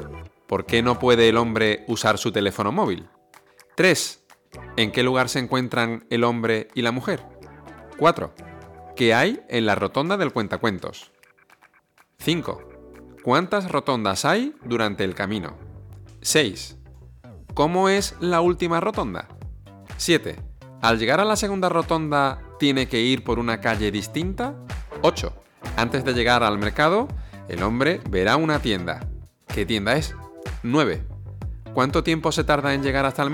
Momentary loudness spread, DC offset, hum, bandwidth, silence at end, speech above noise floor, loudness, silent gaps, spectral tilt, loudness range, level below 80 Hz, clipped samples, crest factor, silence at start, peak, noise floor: 16 LU; under 0.1%; none; 19 kHz; 0 s; 38 dB; -22 LUFS; none; -4.5 dB/octave; 4 LU; -42 dBFS; under 0.1%; 18 dB; 0 s; -6 dBFS; -59 dBFS